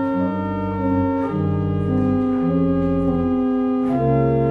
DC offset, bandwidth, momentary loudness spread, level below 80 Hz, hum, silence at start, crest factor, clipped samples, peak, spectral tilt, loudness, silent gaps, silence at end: under 0.1%; 4.4 kHz; 4 LU; -40 dBFS; none; 0 s; 12 dB; under 0.1%; -6 dBFS; -11 dB/octave; -20 LUFS; none; 0 s